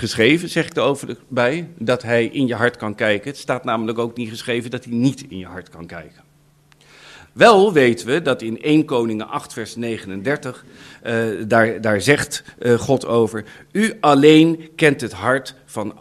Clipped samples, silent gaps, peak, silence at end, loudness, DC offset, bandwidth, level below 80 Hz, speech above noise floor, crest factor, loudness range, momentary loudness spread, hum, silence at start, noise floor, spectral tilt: under 0.1%; none; 0 dBFS; 0.1 s; -18 LUFS; under 0.1%; 14.5 kHz; -56 dBFS; 36 dB; 18 dB; 7 LU; 17 LU; none; 0 s; -54 dBFS; -5.5 dB/octave